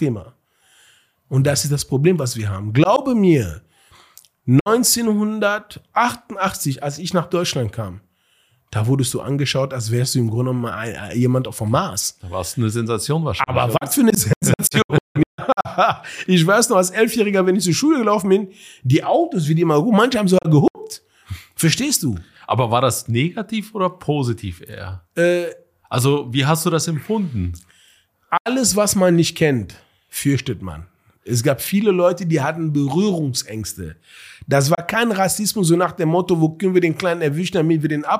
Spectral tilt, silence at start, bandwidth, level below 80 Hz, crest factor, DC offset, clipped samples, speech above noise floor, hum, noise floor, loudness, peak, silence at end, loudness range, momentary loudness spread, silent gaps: -5 dB/octave; 0 s; 15.5 kHz; -50 dBFS; 16 dB; under 0.1%; under 0.1%; 42 dB; none; -61 dBFS; -18 LUFS; -4 dBFS; 0 s; 5 LU; 12 LU; 4.61-4.65 s, 14.36-14.41 s, 14.84-14.89 s, 15.00-15.15 s, 15.26-15.38 s, 20.70-20.74 s, 28.40-28.45 s